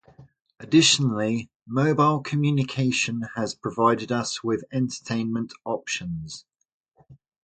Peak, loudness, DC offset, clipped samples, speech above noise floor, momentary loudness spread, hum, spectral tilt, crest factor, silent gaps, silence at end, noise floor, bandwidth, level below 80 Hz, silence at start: -6 dBFS; -24 LUFS; under 0.1%; under 0.1%; 30 dB; 12 LU; none; -4.5 dB/octave; 18 dB; 1.56-1.60 s, 6.73-6.84 s; 0.3 s; -54 dBFS; 9.4 kHz; -60 dBFS; 0.2 s